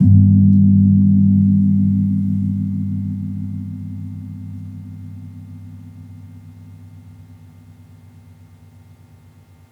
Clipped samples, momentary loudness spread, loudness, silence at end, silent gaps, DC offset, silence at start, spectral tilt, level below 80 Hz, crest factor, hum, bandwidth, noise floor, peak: under 0.1%; 25 LU; -15 LUFS; 2.6 s; none; under 0.1%; 0 s; -12 dB/octave; -54 dBFS; 16 dB; none; 2.2 kHz; -46 dBFS; -2 dBFS